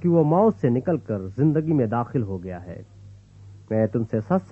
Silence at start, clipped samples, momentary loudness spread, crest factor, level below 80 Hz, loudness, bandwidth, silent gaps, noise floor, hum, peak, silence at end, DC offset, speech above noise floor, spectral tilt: 0 s; under 0.1%; 15 LU; 16 dB; -56 dBFS; -23 LUFS; 6.8 kHz; none; -46 dBFS; 50 Hz at -45 dBFS; -6 dBFS; 0.05 s; under 0.1%; 24 dB; -11 dB/octave